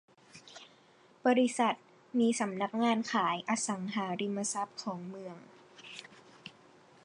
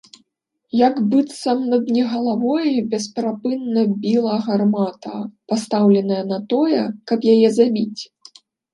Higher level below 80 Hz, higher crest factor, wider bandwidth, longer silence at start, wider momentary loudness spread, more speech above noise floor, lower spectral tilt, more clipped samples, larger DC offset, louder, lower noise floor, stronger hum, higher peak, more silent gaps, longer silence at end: second, -86 dBFS vs -70 dBFS; about the same, 18 dB vs 16 dB; about the same, 11 kHz vs 11.5 kHz; second, 0.35 s vs 0.75 s; first, 22 LU vs 9 LU; second, 31 dB vs 53 dB; second, -4 dB/octave vs -6.5 dB/octave; neither; neither; second, -32 LUFS vs -19 LUFS; second, -62 dBFS vs -71 dBFS; neither; second, -16 dBFS vs -2 dBFS; neither; second, 0.55 s vs 0.7 s